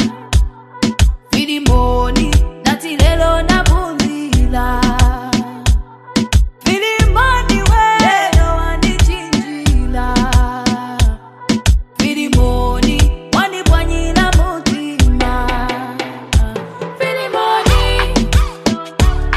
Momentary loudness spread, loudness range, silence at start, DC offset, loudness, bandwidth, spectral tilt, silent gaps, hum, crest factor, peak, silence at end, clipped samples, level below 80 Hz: 6 LU; 3 LU; 0 s; under 0.1%; -15 LUFS; 14.5 kHz; -5 dB/octave; none; none; 12 dB; 0 dBFS; 0 s; under 0.1%; -16 dBFS